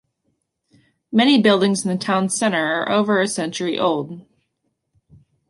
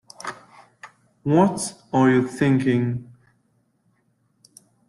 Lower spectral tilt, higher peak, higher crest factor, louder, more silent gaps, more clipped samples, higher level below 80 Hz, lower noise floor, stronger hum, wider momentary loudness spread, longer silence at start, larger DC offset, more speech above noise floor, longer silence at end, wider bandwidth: second, -4 dB/octave vs -6.5 dB/octave; about the same, -4 dBFS vs -6 dBFS; about the same, 18 dB vs 18 dB; first, -18 LUFS vs -21 LUFS; neither; neither; second, -66 dBFS vs -60 dBFS; first, -73 dBFS vs -66 dBFS; neither; second, 9 LU vs 16 LU; first, 1.1 s vs 0.25 s; neither; first, 55 dB vs 47 dB; second, 1.3 s vs 1.85 s; about the same, 11.5 kHz vs 12.5 kHz